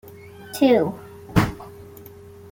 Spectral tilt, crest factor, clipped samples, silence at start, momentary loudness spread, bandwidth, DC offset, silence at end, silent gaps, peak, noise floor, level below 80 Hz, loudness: -6.5 dB/octave; 22 dB; under 0.1%; 0.05 s; 25 LU; 17 kHz; under 0.1%; 0.5 s; none; -2 dBFS; -43 dBFS; -42 dBFS; -21 LUFS